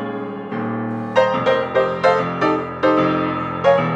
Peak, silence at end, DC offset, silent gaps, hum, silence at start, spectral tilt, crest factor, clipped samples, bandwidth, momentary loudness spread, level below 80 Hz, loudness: -2 dBFS; 0 s; under 0.1%; none; none; 0 s; -7 dB/octave; 16 dB; under 0.1%; 8 kHz; 9 LU; -54 dBFS; -19 LUFS